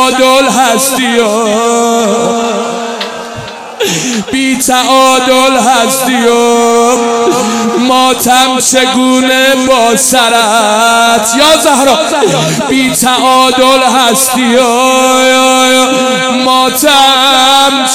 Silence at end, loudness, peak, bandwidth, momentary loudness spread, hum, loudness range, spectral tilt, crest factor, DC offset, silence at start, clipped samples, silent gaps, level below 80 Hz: 0 s; -7 LUFS; 0 dBFS; over 20 kHz; 6 LU; none; 4 LU; -2 dB/octave; 8 dB; 0.3%; 0 s; 1%; none; -44 dBFS